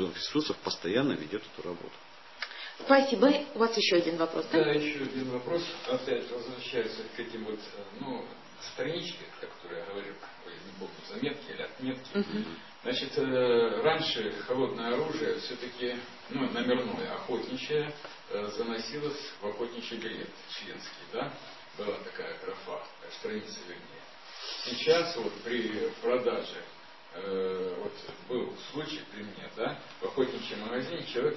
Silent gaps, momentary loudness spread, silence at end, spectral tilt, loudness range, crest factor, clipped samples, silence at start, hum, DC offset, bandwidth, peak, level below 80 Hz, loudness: none; 17 LU; 0 s; -4.5 dB/octave; 11 LU; 26 dB; under 0.1%; 0 s; none; 0.2%; 6.2 kHz; -8 dBFS; -72 dBFS; -33 LUFS